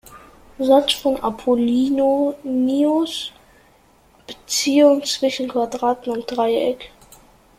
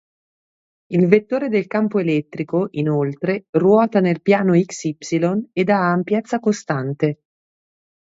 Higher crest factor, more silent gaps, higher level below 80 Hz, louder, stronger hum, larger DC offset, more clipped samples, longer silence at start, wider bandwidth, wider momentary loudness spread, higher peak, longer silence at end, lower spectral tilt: about the same, 18 dB vs 18 dB; second, none vs 3.49-3.53 s; first, -54 dBFS vs -64 dBFS; about the same, -19 LUFS vs -19 LUFS; neither; neither; neither; second, 0.1 s vs 0.9 s; first, 16 kHz vs 8 kHz; first, 11 LU vs 8 LU; about the same, -2 dBFS vs 0 dBFS; second, 0.7 s vs 0.85 s; second, -3 dB/octave vs -7 dB/octave